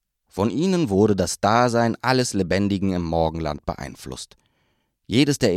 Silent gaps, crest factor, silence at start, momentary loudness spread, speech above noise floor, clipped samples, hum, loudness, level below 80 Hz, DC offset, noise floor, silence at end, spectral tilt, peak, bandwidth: none; 20 dB; 0.35 s; 16 LU; 48 dB; under 0.1%; none; -21 LUFS; -44 dBFS; under 0.1%; -69 dBFS; 0 s; -5.5 dB/octave; -2 dBFS; 14.5 kHz